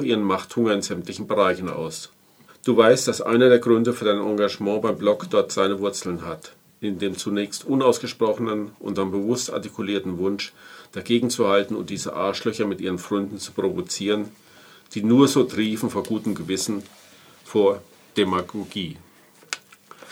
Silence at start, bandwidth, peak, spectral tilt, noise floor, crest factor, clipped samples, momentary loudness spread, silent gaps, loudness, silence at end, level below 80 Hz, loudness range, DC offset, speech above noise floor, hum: 0 s; 17 kHz; -2 dBFS; -4.5 dB/octave; -47 dBFS; 22 dB; under 0.1%; 14 LU; none; -23 LUFS; 0 s; -64 dBFS; 6 LU; under 0.1%; 25 dB; none